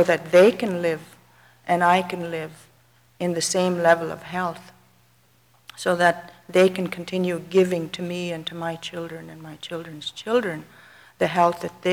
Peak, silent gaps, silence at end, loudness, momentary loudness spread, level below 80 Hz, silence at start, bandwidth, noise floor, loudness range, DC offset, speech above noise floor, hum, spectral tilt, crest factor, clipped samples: -4 dBFS; none; 0 s; -23 LUFS; 15 LU; -66 dBFS; 0 s; 19 kHz; -60 dBFS; 4 LU; under 0.1%; 37 dB; none; -4.5 dB/octave; 20 dB; under 0.1%